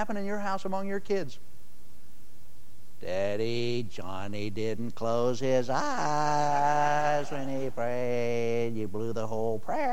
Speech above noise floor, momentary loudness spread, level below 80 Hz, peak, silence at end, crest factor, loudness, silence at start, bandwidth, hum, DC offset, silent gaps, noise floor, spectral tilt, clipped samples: 28 dB; 9 LU; -62 dBFS; -14 dBFS; 0 s; 16 dB; -30 LUFS; 0 s; 16.5 kHz; none; 4%; none; -58 dBFS; -5.5 dB/octave; under 0.1%